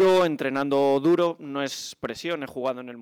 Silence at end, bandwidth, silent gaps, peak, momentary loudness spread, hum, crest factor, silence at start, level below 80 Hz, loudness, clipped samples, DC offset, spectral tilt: 0 s; 16.5 kHz; none; -12 dBFS; 11 LU; none; 12 dB; 0 s; -66 dBFS; -25 LUFS; under 0.1%; under 0.1%; -5 dB/octave